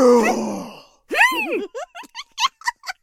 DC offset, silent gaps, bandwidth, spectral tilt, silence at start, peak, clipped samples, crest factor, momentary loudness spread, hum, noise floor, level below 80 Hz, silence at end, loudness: under 0.1%; none; 16.5 kHz; -3 dB/octave; 0 s; -2 dBFS; under 0.1%; 18 dB; 18 LU; none; -39 dBFS; -62 dBFS; 0.1 s; -19 LUFS